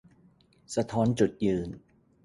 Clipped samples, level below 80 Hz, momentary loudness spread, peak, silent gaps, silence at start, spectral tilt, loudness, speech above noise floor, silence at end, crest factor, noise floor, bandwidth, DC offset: under 0.1%; -56 dBFS; 13 LU; -12 dBFS; none; 0.7 s; -6.5 dB/octave; -28 LUFS; 34 dB; 0.45 s; 18 dB; -62 dBFS; 11.5 kHz; under 0.1%